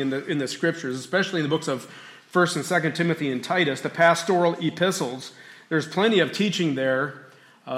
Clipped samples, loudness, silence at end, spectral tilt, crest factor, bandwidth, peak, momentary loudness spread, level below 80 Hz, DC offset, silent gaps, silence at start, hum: under 0.1%; -24 LUFS; 0 s; -4.5 dB/octave; 18 dB; 15.5 kHz; -6 dBFS; 11 LU; -74 dBFS; under 0.1%; none; 0 s; none